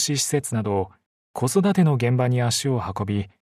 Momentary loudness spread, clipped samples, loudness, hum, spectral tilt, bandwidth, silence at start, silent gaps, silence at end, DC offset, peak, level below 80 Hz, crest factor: 8 LU; under 0.1%; -22 LUFS; none; -5 dB/octave; 14 kHz; 0 s; 1.06-1.34 s; 0.15 s; under 0.1%; -8 dBFS; -56 dBFS; 14 dB